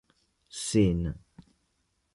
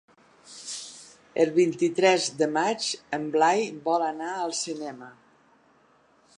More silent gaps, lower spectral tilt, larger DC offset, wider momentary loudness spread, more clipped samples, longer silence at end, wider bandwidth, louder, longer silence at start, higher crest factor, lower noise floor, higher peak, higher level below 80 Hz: neither; first, -6 dB/octave vs -3.5 dB/octave; neither; about the same, 19 LU vs 17 LU; neither; second, 0.95 s vs 1.25 s; about the same, 11.5 kHz vs 11 kHz; about the same, -28 LUFS vs -26 LUFS; about the same, 0.55 s vs 0.5 s; about the same, 18 dB vs 20 dB; first, -75 dBFS vs -61 dBFS; second, -12 dBFS vs -8 dBFS; first, -46 dBFS vs -76 dBFS